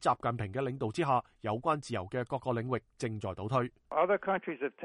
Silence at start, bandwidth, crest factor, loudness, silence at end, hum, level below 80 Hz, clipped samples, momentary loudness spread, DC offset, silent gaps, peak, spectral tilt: 0 s; 11.5 kHz; 18 dB; -34 LUFS; 0 s; none; -64 dBFS; under 0.1%; 8 LU; under 0.1%; none; -16 dBFS; -6.5 dB/octave